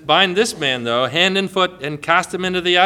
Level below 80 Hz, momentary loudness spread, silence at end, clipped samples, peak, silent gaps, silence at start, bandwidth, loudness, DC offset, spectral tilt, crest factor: -54 dBFS; 6 LU; 0 s; under 0.1%; 0 dBFS; none; 0.05 s; 15.5 kHz; -17 LUFS; under 0.1%; -3.5 dB/octave; 18 dB